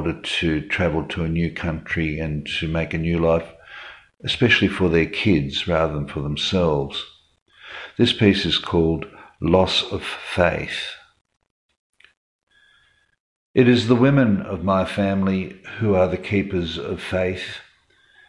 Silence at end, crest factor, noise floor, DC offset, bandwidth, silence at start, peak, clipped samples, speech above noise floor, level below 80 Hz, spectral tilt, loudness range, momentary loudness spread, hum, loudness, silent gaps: 0.7 s; 18 dB; -60 dBFS; under 0.1%; 11.5 kHz; 0 s; -2 dBFS; under 0.1%; 40 dB; -44 dBFS; -6 dB/octave; 4 LU; 15 LU; none; -21 LUFS; 7.42-7.46 s, 11.21-11.25 s, 11.51-11.69 s, 11.79-11.93 s, 12.17-12.47 s, 13.20-13.54 s